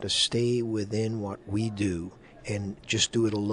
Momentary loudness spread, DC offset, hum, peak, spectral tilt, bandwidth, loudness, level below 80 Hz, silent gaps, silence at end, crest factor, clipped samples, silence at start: 11 LU; under 0.1%; none; -12 dBFS; -4 dB/octave; 11 kHz; -28 LUFS; -56 dBFS; none; 0 s; 16 dB; under 0.1%; 0 s